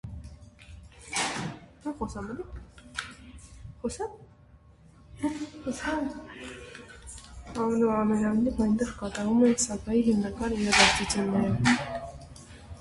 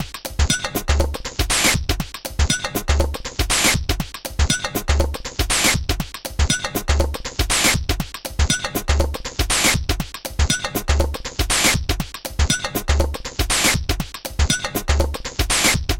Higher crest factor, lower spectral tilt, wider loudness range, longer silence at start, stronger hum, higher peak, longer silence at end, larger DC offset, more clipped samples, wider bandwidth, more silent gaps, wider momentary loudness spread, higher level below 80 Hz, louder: first, 24 dB vs 16 dB; about the same, -4 dB/octave vs -3 dB/octave; first, 14 LU vs 1 LU; about the same, 0.05 s vs 0 s; neither; about the same, -6 dBFS vs -4 dBFS; about the same, 0 s vs 0 s; neither; neither; second, 11.5 kHz vs 17 kHz; neither; first, 22 LU vs 9 LU; second, -48 dBFS vs -24 dBFS; second, -27 LUFS vs -20 LUFS